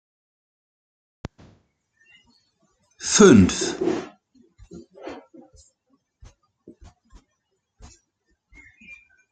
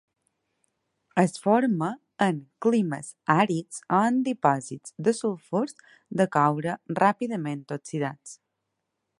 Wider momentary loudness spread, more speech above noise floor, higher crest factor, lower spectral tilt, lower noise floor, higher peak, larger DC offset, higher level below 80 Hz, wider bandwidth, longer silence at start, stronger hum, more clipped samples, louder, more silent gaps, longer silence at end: first, 30 LU vs 10 LU; first, 59 dB vs 55 dB; about the same, 24 dB vs 22 dB; second, -4.5 dB/octave vs -6 dB/octave; second, -75 dBFS vs -81 dBFS; about the same, -2 dBFS vs -4 dBFS; neither; first, -54 dBFS vs -74 dBFS; second, 9.2 kHz vs 11.5 kHz; first, 3 s vs 1.15 s; neither; neither; first, -17 LUFS vs -26 LUFS; neither; first, 4.15 s vs 0.85 s